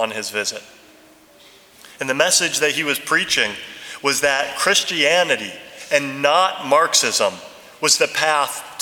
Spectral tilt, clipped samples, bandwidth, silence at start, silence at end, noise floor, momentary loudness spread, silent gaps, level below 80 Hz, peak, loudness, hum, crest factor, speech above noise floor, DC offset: -0.5 dB/octave; under 0.1%; 20 kHz; 0 s; 0 s; -49 dBFS; 10 LU; none; -64 dBFS; 0 dBFS; -17 LUFS; none; 20 dB; 30 dB; under 0.1%